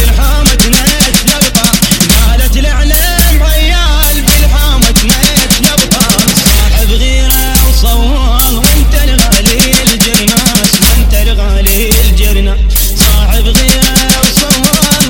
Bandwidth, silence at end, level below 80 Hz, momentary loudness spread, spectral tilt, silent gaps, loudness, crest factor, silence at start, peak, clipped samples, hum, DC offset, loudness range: 17.5 kHz; 0 s; -10 dBFS; 4 LU; -3 dB/octave; none; -7 LUFS; 6 dB; 0 s; 0 dBFS; 1%; none; 0.3%; 1 LU